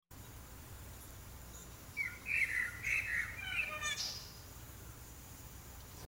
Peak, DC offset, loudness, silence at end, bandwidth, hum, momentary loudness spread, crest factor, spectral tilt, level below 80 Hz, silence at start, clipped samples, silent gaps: -24 dBFS; under 0.1%; -37 LUFS; 0 s; 17.5 kHz; none; 18 LU; 20 dB; -1.5 dB/octave; -58 dBFS; 0.1 s; under 0.1%; none